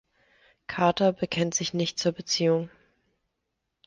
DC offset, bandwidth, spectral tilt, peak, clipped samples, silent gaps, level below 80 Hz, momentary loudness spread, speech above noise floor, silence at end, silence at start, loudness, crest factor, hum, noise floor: under 0.1%; 10.5 kHz; -4 dB/octave; -10 dBFS; under 0.1%; none; -64 dBFS; 11 LU; 56 dB; 1.2 s; 0.7 s; -26 LUFS; 20 dB; none; -81 dBFS